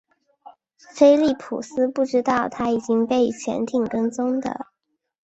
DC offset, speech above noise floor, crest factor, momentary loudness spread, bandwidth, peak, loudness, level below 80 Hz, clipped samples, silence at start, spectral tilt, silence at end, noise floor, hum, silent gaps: under 0.1%; 56 dB; 18 dB; 13 LU; 8.2 kHz; -2 dBFS; -21 LUFS; -60 dBFS; under 0.1%; 0.45 s; -5.5 dB/octave; 0.6 s; -77 dBFS; none; none